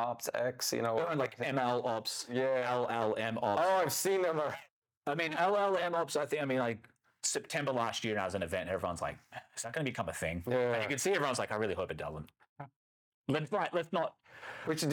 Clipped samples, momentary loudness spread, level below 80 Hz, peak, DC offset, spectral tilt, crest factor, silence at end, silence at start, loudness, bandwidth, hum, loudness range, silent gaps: under 0.1%; 12 LU; -70 dBFS; -20 dBFS; under 0.1%; -4 dB/octave; 16 dB; 0 s; 0 s; -34 LUFS; over 20 kHz; none; 4 LU; 4.71-4.82 s, 4.97-5.01 s, 12.49-12.56 s, 12.76-13.24 s